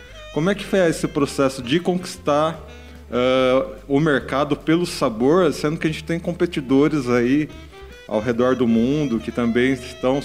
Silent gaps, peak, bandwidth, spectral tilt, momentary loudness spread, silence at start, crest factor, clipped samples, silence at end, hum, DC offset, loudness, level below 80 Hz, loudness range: none; -6 dBFS; 15.5 kHz; -6 dB/octave; 8 LU; 0 s; 14 dB; under 0.1%; 0 s; none; 0.2%; -20 LUFS; -44 dBFS; 1 LU